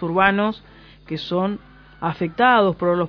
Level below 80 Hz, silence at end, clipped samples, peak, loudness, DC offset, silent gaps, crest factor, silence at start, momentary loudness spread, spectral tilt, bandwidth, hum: -50 dBFS; 0 s; under 0.1%; -2 dBFS; -20 LUFS; under 0.1%; none; 20 dB; 0 s; 16 LU; -8 dB/octave; 5.4 kHz; none